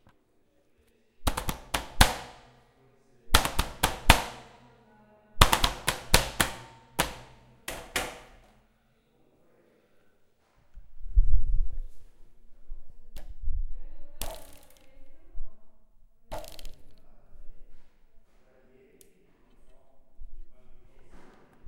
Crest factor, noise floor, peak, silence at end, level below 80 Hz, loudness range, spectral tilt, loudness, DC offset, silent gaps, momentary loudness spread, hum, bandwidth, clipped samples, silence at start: 28 dB; -67 dBFS; 0 dBFS; 0 s; -34 dBFS; 23 LU; -3 dB/octave; -28 LUFS; under 0.1%; none; 26 LU; none; 16.5 kHz; under 0.1%; 1.2 s